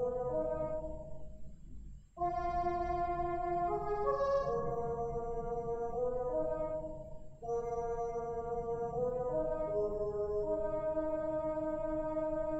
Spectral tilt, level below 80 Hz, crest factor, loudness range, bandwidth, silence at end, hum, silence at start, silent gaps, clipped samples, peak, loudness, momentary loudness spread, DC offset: -8.5 dB/octave; -50 dBFS; 16 dB; 3 LU; 8 kHz; 0 s; none; 0 s; none; under 0.1%; -20 dBFS; -37 LUFS; 13 LU; under 0.1%